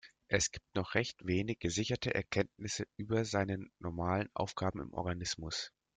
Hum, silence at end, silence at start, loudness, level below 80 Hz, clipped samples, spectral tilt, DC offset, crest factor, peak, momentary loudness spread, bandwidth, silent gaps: none; 0.3 s; 0.05 s; -37 LUFS; -60 dBFS; under 0.1%; -4 dB/octave; under 0.1%; 24 dB; -14 dBFS; 7 LU; 9.6 kHz; none